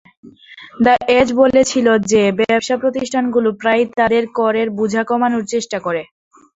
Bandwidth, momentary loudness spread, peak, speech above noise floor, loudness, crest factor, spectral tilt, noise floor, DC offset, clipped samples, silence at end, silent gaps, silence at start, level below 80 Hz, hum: 8 kHz; 8 LU; -2 dBFS; 25 dB; -15 LUFS; 14 dB; -4.5 dB/octave; -40 dBFS; under 0.1%; under 0.1%; 0.55 s; none; 0.25 s; -50 dBFS; none